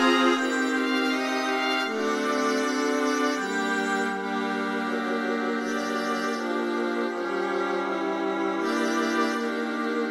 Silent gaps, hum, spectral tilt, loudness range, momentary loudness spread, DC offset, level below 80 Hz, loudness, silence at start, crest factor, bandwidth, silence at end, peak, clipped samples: none; none; -3.5 dB/octave; 2 LU; 3 LU; under 0.1%; -78 dBFS; -26 LUFS; 0 s; 16 dB; 15 kHz; 0 s; -10 dBFS; under 0.1%